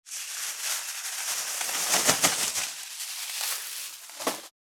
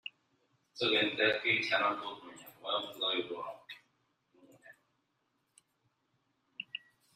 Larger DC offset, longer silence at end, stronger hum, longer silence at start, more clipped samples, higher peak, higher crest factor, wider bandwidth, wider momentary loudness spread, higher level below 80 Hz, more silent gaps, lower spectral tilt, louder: neither; second, 0.15 s vs 0.4 s; neither; about the same, 0.05 s vs 0.05 s; neither; first, -6 dBFS vs -16 dBFS; about the same, 26 dB vs 22 dB; first, over 20 kHz vs 15 kHz; second, 12 LU vs 23 LU; first, -72 dBFS vs -82 dBFS; neither; second, 0.5 dB/octave vs -3.5 dB/octave; first, -27 LUFS vs -32 LUFS